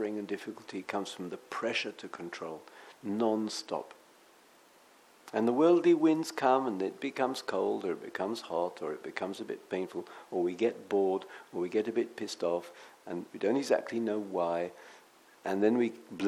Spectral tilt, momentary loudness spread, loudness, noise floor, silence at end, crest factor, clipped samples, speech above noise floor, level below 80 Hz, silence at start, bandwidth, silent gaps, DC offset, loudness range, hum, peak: -5 dB/octave; 14 LU; -33 LUFS; -61 dBFS; 0 s; 20 dB; under 0.1%; 29 dB; -86 dBFS; 0 s; 14 kHz; none; under 0.1%; 7 LU; none; -12 dBFS